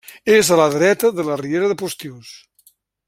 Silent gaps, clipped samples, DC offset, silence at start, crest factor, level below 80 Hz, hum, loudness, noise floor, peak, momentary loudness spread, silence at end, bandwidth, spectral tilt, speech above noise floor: none; under 0.1%; under 0.1%; 0.1 s; 18 dB; -60 dBFS; none; -16 LUFS; -56 dBFS; -2 dBFS; 14 LU; 0.7 s; 16.5 kHz; -4 dB/octave; 39 dB